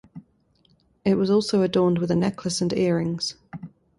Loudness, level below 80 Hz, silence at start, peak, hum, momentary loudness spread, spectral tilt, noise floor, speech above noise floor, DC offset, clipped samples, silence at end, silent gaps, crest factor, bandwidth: -23 LUFS; -58 dBFS; 0.15 s; -8 dBFS; none; 12 LU; -6 dB/octave; -63 dBFS; 41 dB; under 0.1%; under 0.1%; 0.3 s; none; 16 dB; 11.5 kHz